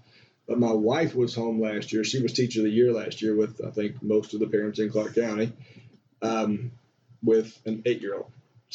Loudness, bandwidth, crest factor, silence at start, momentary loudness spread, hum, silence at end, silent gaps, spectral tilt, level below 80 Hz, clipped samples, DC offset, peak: -26 LUFS; 8 kHz; 16 dB; 0.5 s; 9 LU; none; 0.45 s; none; -6 dB/octave; -72 dBFS; under 0.1%; under 0.1%; -12 dBFS